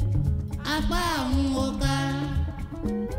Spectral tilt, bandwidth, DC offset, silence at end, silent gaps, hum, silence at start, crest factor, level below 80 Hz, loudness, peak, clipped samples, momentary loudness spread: -5.5 dB/octave; 16 kHz; under 0.1%; 0 s; none; none; 0 s; 14 dB; -32 dBFS; -27 LUFS; -12 dBFS; under 0.1%; 5 LU